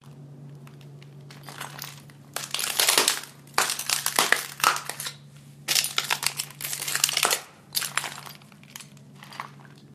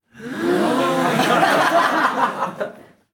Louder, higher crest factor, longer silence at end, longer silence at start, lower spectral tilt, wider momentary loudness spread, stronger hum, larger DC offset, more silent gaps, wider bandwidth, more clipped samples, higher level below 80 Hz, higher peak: second, -24 LUFS vs -18 LUFS; first, 28 dB vs 14 dB; second, 0 s vs 0.35 s; about the same, 0.05 s vs 0.15 s; second, 0 dB/octave vs -4.5 dB/octave; first, 24 LU vs 12 LU; neither; neither; neither; second, 15.5 kHz vs 19.5 kHz; neither; second, -72 dBFS vs -66 dBFS; first, 0 dBFS vs -4 dBFS